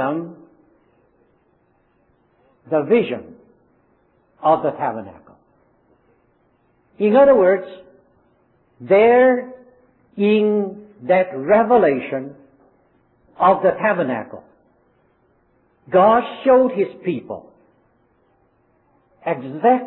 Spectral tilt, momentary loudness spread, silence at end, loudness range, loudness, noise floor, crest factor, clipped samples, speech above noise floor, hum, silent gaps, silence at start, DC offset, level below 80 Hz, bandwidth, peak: -10.5 dB/octave; 19 LU; 0 s; 9 LU; -17 LUFS; -61 dBFS; 18 dB; under 0.1%; 45 dB; none; none; 0 s; under 0.1%; -60 dBFS; 4.2 kHz; -2 dBFS